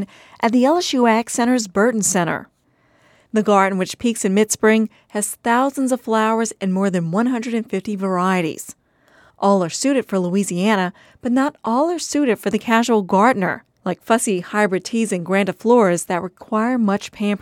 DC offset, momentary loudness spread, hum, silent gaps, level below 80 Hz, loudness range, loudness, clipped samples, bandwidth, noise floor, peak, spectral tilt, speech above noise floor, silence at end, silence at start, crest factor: under 0.1%; 8 LU; none; none; -62 dBFS; 2 LU; -19 LUFS; under 0.1%; 16.5 kHz; -59 dBFS; -2 dBFS; -4.5 dB/octave; 41 dB; 0.05 s; 0 s; 16 dB